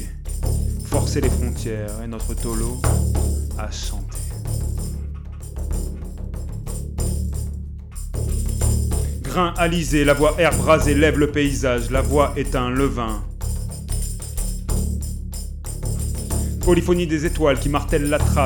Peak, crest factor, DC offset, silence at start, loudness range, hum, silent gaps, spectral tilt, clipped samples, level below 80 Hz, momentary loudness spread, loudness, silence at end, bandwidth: -4 dBFS; 18 dB; under 0.1%; 0 s; 10 LU; none; none; -5.5 dB/octave; under 0.1%; -26 dBFS; 14 LU; -22 LUFS; 0 s; 18.5 kHz